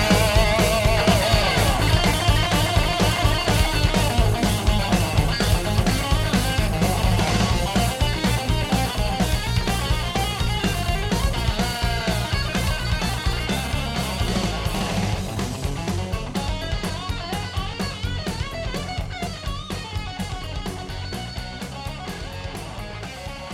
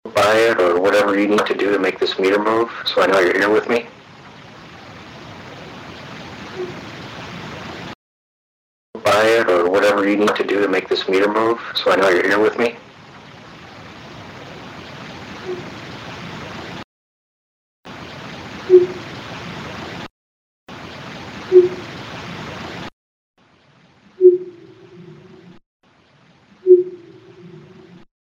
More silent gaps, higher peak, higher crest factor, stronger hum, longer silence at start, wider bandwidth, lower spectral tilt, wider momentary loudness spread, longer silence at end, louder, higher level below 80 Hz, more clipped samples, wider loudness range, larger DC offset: second, none vs 7.95-8.93 s, 16.84-17.83 s, 20.10-20.67 s, 22.93-23.34 s, 25.66-25.80 s; second, -4 dBFS vs 0 dBFS; about the same, 18 dB vs 20 dB; neither; about the same, 0 s vs 0.05 s; about the same, 16.5 kHz vs 15.5 kHz; about the same, -4.5 dB/octave vs -5 dB/octave; second, 12 LU vs 23 LU; second, 0 s vs 0.6 s; second, -23 LUFS vs -16 LUFS; first, -28 dBFS vs -56 dBFS; neither; second, 11 LU vs 17 LU; neither